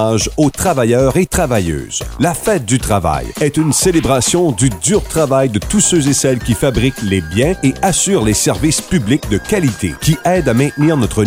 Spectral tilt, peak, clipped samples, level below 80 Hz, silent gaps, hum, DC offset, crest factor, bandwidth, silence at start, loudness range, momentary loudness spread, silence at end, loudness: -4.5 dB/octave; 0 dBFS; under 0.1%; -30 dBFS; none; none; under 0.1%; 12 dB; 16.5 kHz; 0 s; 2 LU; 5 LU; 0 s; -14 LUFS